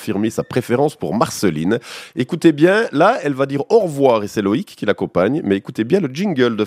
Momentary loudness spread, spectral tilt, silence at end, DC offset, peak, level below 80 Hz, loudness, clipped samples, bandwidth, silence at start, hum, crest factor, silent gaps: 7 LU; -6 dB/octave; 0 s; under 0.1%; 0 dBFS; -60 dBFS; -17 LUFS; under 0.1%; 15.5 kHz; 0 s; none; 16 dB; none